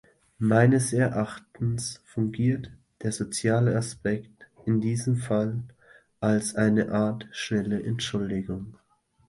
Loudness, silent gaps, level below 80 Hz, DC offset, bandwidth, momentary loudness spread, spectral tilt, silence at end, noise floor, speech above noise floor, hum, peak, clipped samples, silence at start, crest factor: -27 LUFS; none; -56 dBFS; under 0.1%; 11.5 kHz; 11 LU; -6 dB/octave; 0.55 s; -53 dBFS; 28 dB; none; -6 dBFS; under 0.1%; 0.4 s; 20 dB